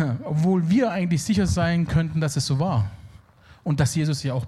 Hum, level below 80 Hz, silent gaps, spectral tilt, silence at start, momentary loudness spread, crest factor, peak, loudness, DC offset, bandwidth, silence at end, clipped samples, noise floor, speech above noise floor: none; -46 dBFS; none; -6 dB/octave; 0 s; 5 LU; 14 dB; -8 dBFS; -23 LUFS; under 0.1%; 13 kHz; 0 s; under 0.1%; -50 dBFS; 28 dB